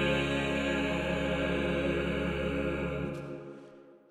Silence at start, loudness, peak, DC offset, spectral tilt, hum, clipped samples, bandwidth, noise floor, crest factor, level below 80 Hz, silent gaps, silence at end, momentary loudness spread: 0 s; -31 LUFS; -18 dBFS; under 0.1%; -6 dB/octave; none; under 0.1%; 13 kHz; -53 dBFS; 14 dB; -44 dBFS; none; 0.15 s; 12 LU